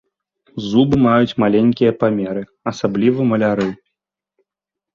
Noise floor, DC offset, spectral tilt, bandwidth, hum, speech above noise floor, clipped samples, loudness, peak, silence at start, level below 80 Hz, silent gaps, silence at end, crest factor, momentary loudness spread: -85 dBFS; under 0.1%; -7.5 dB/octave; 7.2 kHz; none; 70 dB; under 0.1%; -16 LUFS; -2 dBFS; 0.55 s; -50 dBFS; none; 1.2 s; 16 dB; 11 LU